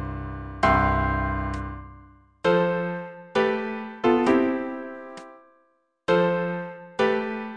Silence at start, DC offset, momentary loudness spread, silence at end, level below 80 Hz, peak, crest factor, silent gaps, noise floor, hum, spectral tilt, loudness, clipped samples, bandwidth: 0 s; under 0.1%; 15 LU; 0 s; -40 dBFS; -8 dBFS; 18 dB; none; -66 dBFS; none; -7 dB/octave; -24 LUFS; under 0.1%; 10 kHz